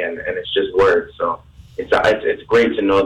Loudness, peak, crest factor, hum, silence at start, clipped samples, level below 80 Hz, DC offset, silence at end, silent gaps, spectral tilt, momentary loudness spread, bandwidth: -17 LUFS; -4 dBFS; 14 dB; none; 0 s; under 0.1%; -44 dBFS; under 0.1%; 0 s; none; -5.5 dB/octave; 12 LU; 9.6 kHz